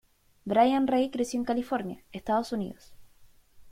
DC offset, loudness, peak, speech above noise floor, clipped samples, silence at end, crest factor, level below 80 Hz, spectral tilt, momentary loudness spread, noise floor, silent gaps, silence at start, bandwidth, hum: under 0.1%; -28 LUFS; -10 dBFS; 29 dB; under 0.1%; 0 s; 20 dB; -62 dBFS; -5.5 dB/octave; 16 LU; -57 dBFS; none; 0.45 s; 15 kHz; none